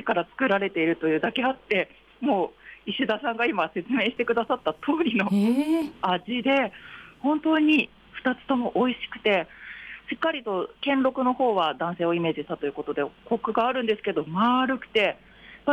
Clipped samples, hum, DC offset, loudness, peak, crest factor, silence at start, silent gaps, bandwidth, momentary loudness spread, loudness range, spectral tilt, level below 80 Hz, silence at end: under 0.1%; none; under 0.1%; -25 LUFS; -12 dBFS; 14 dB; 0 s; none; 12 kHz; 8 LU; 2 LU; -6.5 dB/octave; -62 dBFS; 0 s